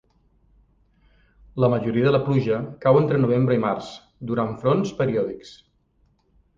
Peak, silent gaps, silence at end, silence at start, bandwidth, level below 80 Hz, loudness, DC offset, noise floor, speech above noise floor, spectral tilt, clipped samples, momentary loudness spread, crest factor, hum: -4 dBFS; none; 1.05 s; 1.55 s; 7.4 kHz; -54 dBFS; -22 LUFS; under 0.1%; -64 dBFS; 43 dB; -8.5 dB/octave; under 0.1%; 12 LU; 18 dB; none